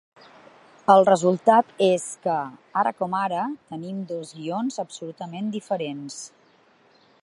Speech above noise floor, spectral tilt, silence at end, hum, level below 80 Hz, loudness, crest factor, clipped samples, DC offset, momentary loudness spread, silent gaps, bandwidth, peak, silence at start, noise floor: 35 dB; -5 dB/octave; 0.95 s; none; -76 dBFS; -23 LUFS; 22 dB; under 0.1%; under 0.1%; 17 LU; none; 11.5 kHz; -2 dBFS; 0.9 s; -58 dBFS